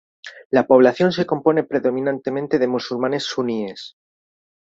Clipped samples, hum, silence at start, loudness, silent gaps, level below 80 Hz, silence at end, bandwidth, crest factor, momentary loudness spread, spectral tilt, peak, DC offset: under 0.1%; none; 0.25 s; -19 LUFS; 0.45-0.50 s; -64 dBFS; 0.85 s; 7.8 kHz; 18 dB; 18 LU; -6 dB/octave; -2 dBFS; under 0.1%